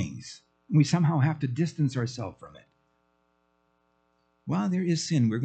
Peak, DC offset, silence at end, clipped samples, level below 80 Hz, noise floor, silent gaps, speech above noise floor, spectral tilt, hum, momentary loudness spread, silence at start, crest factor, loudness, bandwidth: -10 dBFS; under 0.1%; 0 s; under 0.1%; -68 dBFS; -71 dBFS; none; 45 dB; -6.5 dB/octave; none; 16 LU; 0 s; 18 dB; -27 LUFS; 8.8 kHz